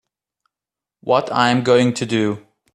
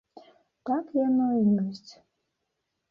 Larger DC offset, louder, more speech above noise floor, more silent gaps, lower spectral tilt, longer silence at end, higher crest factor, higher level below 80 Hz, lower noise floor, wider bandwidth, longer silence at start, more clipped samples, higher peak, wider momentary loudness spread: neither; first, -17 LUFS vs -26 LUFS; first, 72 dB vs 55 dB; neither; second, -5.5 dB/octave vs -9 dB/octave; second, 0.35 s vs 1 s; first, 20 dB vs 14 dB; first, -60 dBFS vs -72 dBFS; first, -88 dBFS vs -81 dBFS; first, 11.5 kHz vs 7 kHz; first, 1.05 s vs 0.65 s; neither; first, 0 dBFS vs -14 dBFS; second, 12 LU vs 15 LU